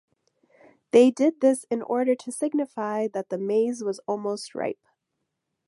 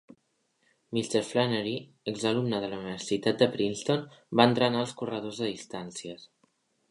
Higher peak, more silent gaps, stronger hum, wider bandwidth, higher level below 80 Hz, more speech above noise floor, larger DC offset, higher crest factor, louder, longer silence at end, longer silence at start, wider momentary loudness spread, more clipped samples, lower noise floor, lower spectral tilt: about the same, -6 dBFS vs -4 dBFS; neither; neither; about the same, 11.5 kHz vs 11.5 kHz; second, -78 dBFS vs -70 dBFS; first, 57 dB vs 45 dB; neither; about the same, 20 dB vs 24 dB; first, -25 LUFS vs -29 LUFS; first, 0.95 s vs 0.65 s; about the same, 0.95 s vs 0.9 s; second, 12 LU vs 15 LU; neither; first, -80 dBFS vs -74 dBFS; about the same, -5 dB/octave vs -5 dB/octave